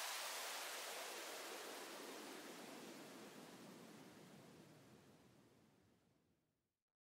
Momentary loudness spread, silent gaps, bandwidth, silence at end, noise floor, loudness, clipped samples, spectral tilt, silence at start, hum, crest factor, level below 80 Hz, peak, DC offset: 18 LU; none; 16 kHz; 1.1 s; -88 dBFS; -51 LUFS; under 0.1%; -1.5 dB/octave; 0 s; none; 20 dB; under -90 dBFS; -36 dBFS; under 0.1%